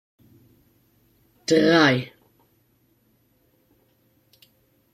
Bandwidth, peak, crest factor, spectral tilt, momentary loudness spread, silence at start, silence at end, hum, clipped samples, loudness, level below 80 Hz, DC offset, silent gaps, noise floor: 13 kHz; -4 dBFS; 22 dB; -5 dB/octave; 19 LU; 1.5 s; 2.9 s; none; under 0.1%; -19 LUFS; -66 dBFS; under 0.1%; none; -64 dBFS